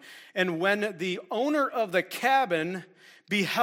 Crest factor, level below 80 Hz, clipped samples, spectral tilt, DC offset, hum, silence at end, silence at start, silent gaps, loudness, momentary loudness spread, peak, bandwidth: 18 dB; -80 dBFS; under 0.1%; -4.5 dB/octave; under 0.1%; none; 0 s; 0.05 s; none; -27 LUFS; 8 LU; -10 dBFS; 16.5 kHz